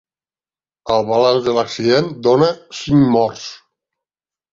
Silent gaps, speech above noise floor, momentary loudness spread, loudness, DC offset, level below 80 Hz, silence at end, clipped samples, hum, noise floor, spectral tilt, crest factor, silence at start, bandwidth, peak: none; over 75 dB; 14 LU; -15 LUFS; under 0.1%; -50 dBFS; 0.95 s; under 0.1%; none; under -90 dBFS; -6 dB/octave; 16 dB; 0.85 s; 7.6 kHz; -2 dBFS